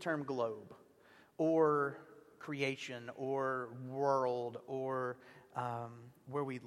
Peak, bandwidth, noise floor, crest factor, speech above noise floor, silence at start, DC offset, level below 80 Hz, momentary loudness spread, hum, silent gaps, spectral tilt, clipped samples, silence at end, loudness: -18 dBFS; 13 kHz; -65 dBFS; 20 dB; 27 dB; 0 s; under 0.1%; -84 dBFS; 18 LU; none; none; -6.5 dB/octave; under 0.1%; 0 s; -38 LUFS